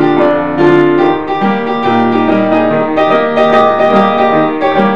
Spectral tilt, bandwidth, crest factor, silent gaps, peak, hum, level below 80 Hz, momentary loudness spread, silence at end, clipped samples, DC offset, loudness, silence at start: -7.5 dB/octave; 7.4 kHz; 10 dB; none; 0 dBFS; none; -48 dBFS; 4 LU; 0 s; 0.2%; 3%; -10 LUFS; 0 s